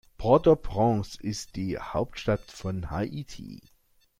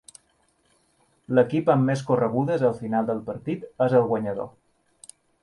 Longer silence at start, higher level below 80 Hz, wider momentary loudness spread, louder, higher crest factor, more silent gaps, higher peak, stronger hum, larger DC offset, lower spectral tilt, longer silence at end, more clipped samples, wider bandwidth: second, 0.2 s vs 1.3 s; first, -46 dBFS vs -64 dBFS; first, 16 LU vs 10 LU; second, -27 LUFS vs -24 LUFS; about the same, 20 dB vs 18 dB; neither; about the same, -6 dBFS vs -6 dBFS; neither; neither; second, -6.5 dB/octave vs -8 dB/octave; second, 0.65 s vs 0.95 s; neither; first, 15.5 kHz vs 11.5 kHz